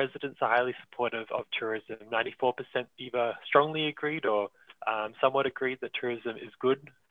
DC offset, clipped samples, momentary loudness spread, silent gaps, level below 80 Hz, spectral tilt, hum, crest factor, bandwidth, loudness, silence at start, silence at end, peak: under 0.1%; under 0.1%; 9 LU; none; -76 dBFS; -7 dB/octave; none; 24 dB; 4.8 kHz; -31 LUFS; 0 s; 0.25 s; -8 dBFS